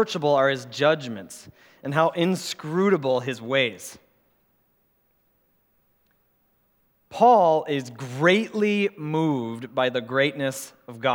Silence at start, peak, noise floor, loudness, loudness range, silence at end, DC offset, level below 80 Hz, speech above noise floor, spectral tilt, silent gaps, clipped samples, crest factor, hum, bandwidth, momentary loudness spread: 0 s; -4 dBFS; -67 dBFS; -23 LUFS; 7 LU; 0 s; under 0.1%; -74 dBFS; 44 dB; -5 dB/octave; none; under 0.1%; 20 dB; none; 19.5 kHz; 17 LU